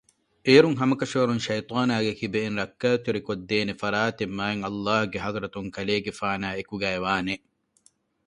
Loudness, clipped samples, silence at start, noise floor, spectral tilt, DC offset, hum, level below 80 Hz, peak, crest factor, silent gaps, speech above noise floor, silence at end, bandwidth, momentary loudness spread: -25 LUFS; under 0.1%; 0.45 s; -64 dBFS; -5.5 dB/octave; under 0.1%; none; -58 dBFS; -4 dBFS; 22 dB; none; 39 dB; 0.9 s; 11 kHz; 10 LU